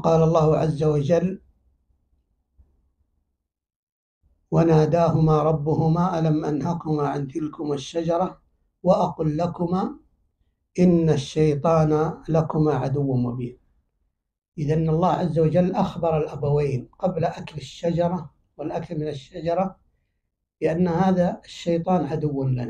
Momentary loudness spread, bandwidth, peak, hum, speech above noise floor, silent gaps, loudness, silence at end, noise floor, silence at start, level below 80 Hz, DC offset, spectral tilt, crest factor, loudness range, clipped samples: 11 LU; 9 kHz; -6 dBFS; none; 58 dB; 3.76-4.21 s; -23 LUFS; 0 s; -79 dBFS; 0 s; -48 dBFS; under 0.1%; -8.5 dB/octave; 18 dB; 6 LU; under 0.1%